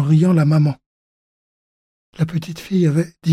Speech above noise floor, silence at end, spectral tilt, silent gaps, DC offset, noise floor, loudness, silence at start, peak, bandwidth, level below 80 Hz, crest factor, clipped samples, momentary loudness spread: over 74 dB; 0 s; -8.5 dB/octave; 0.86-2.13 s; under 0.1%; under -90 dBFS; -18 LUFS; 0 s; -6 dBFS; 11.5 kHz; -56 dBFS; 12 dB; under 0.1%; 11 LU